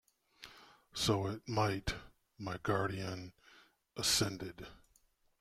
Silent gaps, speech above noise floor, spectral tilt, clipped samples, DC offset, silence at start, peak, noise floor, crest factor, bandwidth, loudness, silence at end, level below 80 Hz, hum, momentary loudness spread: none; 36 dB; -3.5 dB/octave; under 0.1%; under 0.1%; 0.4 s; -18 dBFS; -73 dBFS; 22 dB; 16 kHz; -37 LUFS; 0.65 s; -58 dBFS; none; 22 LU